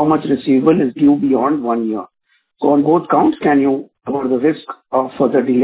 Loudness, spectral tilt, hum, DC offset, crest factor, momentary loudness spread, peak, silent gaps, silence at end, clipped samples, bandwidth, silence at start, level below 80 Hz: -15 LUFS; -11.5 dB/octave; none; under 0.1%; 14 dB; 9 LU; 0 dBFS; none; 0 s; under 0.1%; 4 kHz; 0 s; -54 dBFS